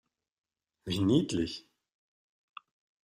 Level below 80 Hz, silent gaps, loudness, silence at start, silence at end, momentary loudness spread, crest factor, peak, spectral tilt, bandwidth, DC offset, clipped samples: -64 dBFS; none; -30 LUFS; 0.85 s; 1.55 s; 18 LU; 22 dB; -14 dBFS; -6 dB/octave; 15 kHz; under 0.1%; under 0.1%